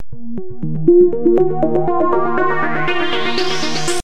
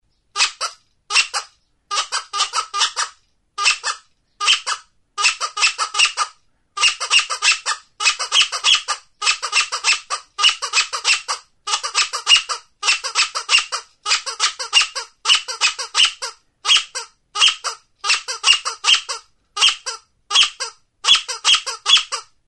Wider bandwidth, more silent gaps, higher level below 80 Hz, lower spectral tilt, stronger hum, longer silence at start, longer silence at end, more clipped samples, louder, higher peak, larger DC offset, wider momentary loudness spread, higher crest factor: about the same, 11.5 kHz vs 11.5 kHz; neither; first, -40 dBFS vs -62 dBFS; first, -5 dB/octave vs 4.5 dB/octave; neither; second, 0.1 s vs 0.35 s; second, 0 s vs 0.25 s; neither; about the same, -16 LUFS vs -17 LUFS; about the same, 0 dBFS vs 0 dBFS; first, 10% vs under 0.1%; about the same, 14 LU vs 13 LU; second, 14 dB vs 20 dB